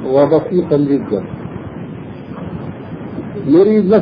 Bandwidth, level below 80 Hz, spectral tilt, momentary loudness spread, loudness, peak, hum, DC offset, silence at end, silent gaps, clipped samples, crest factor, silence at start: 5.2 kHz; -46 dBFS; -11 dB/octave; 18 LU; -14 LUFS; 0 dBFS; none; under 0.1%; 0 s; none; under 0.1%; 16 dB; 0 s